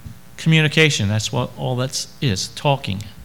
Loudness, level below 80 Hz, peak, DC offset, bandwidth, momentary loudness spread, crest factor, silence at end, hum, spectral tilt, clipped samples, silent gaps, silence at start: -19 LUFS; -50 dBFS; 0 dBFS; 0.8%; 17.5 kHz; 9 LU; 20 dB; 0 s; none; -4.5 dB/octave; under 0.1%; none; 0.05 s